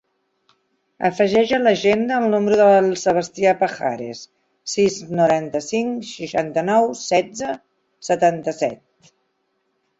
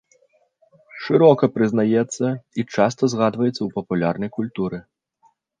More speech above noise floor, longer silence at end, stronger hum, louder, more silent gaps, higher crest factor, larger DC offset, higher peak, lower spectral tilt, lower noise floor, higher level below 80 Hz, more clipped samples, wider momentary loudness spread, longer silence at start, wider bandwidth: first, 51 dB vs 42 dB; first, 1.25 s vs 0.8 s; neither; about the same, -19 LUFS vs -20 LUFS; neither; about the same, 16 dB vs 20 dB; neither; about the same, -2 dBFS vs -2 dBFS; second, -4.5 dB/octave vs -6.5 dB/octave; first, -70 dBFS vs -61 dBFS; about the same, -60 dBFS vs -60 dBFS; neither; about the same, 12 LU vs 12 LU; about the same, 1 s vs 0.95 s; second, 8 kHz vs 9.8 kHz